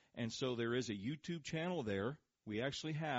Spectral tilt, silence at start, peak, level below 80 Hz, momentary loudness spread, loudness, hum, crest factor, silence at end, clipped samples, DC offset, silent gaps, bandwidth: -4.5 dB/octave; 0.15 s; -26 dBFS; -74 dBFS; 6 LU; -42 LUFS; none; 16 dB; 0 s; under 0.1%; under 0.1%; none; 7.6 kHz